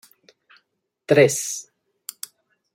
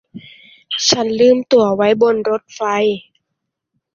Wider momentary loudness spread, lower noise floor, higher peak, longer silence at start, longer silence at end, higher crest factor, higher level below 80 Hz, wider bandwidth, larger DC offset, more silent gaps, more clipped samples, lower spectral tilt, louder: first, 22 LU vs 8 LU; second, -73 dBFS vs -77 dBFS; about the same, -2 dBFS vs 0 dBFS; first, 1.1 s vs 0.15 s; first, 1.1 s vs 0.95 s; first, 22 dB vs 16 dB; second, -68 dBFS vs -60 dBFS; first, 16.5 kHz vs 7.4 kHz; neither; neither; neither; about the same, -4 dB/octave vs -3.5 dB/octave; second, -19 LUFS vs -15 LUFS